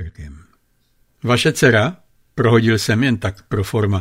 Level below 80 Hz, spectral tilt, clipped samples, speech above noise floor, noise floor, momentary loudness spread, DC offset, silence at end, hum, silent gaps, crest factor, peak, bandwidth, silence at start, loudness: -44 dBFS; -5.5 dB/octave; under 0.1%; 44 dB; -60 dBFS; 15 LU; under 0.1%; 0 s; none; none; 16 dB; -2 dBFS; 16 kHz; 0 s; -17 LUFS